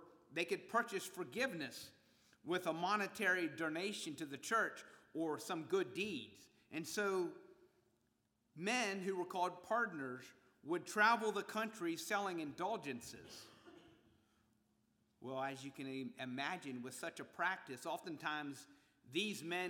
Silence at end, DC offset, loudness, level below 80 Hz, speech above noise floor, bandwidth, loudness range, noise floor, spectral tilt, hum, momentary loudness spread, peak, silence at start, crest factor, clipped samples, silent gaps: 0 s; under 0.1%; -41 LUFS; -86 dBFS; 40 dB; over 20 kHz; 8 LU; -82 dBFS; -3.5 dB/octave; none; 13 LU; -20 dBFS; 0 s; 24 dB; under 0.1%; none